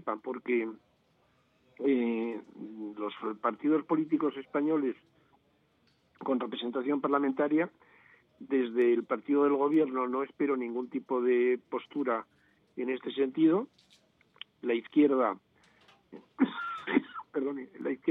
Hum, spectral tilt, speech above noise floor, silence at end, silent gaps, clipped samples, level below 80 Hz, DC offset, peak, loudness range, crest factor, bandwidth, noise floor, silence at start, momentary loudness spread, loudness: none; -8 dB/octave; 40 dB; 0 s; none; under 0.1%; -86 dBFS; under 0.1%; -12 dBFS; 4 LU; 20 dB; 4.1 kHz; -70 dBFS; 0.05 s; 12 LU; -31 LUFS